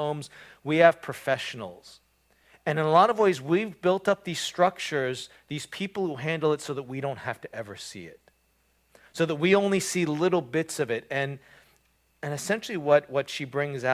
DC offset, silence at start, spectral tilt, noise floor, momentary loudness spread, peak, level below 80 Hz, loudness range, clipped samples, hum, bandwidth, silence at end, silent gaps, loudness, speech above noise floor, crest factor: under 0.1%; 0 s; -5 dB/octave; -68 dBFS; 17 LU; -4 dBFS; -68 dBFS; 7 LU; under 0.1%; none; 16 kHz; 0 s; none; -26 LUFS; 41 dB; 24 dB